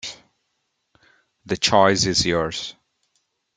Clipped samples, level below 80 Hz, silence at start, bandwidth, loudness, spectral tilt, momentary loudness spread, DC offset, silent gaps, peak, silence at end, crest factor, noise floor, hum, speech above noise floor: under 0.1%; -52 dBFS; 0.05 s; 9.6 kHz; -19 LUFS; -3 dB/octave; 17 LU; under 0.1%; none; -2 dBFS; 0.85 s; 22 dB; -74 dBFS; none; 54 dB